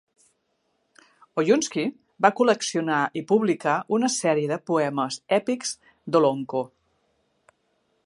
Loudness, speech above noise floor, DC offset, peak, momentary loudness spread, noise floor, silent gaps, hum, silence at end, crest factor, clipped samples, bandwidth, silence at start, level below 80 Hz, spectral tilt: -24 LUFS; 49 dB; under 0.1%; -2 dBFS; 9 LU; -72 dBFS; none; none; 1.4 s; 24 dB; under 0.1%; 11.5 kHz; 1.35 s; -76 dBFS; -4.5 dB/octave